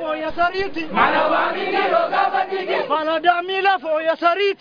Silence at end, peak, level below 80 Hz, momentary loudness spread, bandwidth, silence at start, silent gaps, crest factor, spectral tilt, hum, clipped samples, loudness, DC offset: 0.05 s; -2 dBFS; -52 dBFS; 5 LU; 5.2 kHz; 0 s; none; 18 dB; -5.5 dB/octave; none; under 0.1%; -19 LUFS; under 0.1%